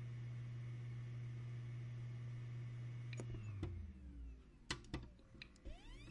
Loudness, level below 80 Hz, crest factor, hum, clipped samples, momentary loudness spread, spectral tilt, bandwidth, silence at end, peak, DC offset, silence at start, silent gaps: -51 LUFS; -60 dBFS; 22 dB; none; under 0.1%; 10 LU; -5.5 dB/octave; 10.5 kHz; 0 s; -26 dBFS; under 0.1%; 0 s; none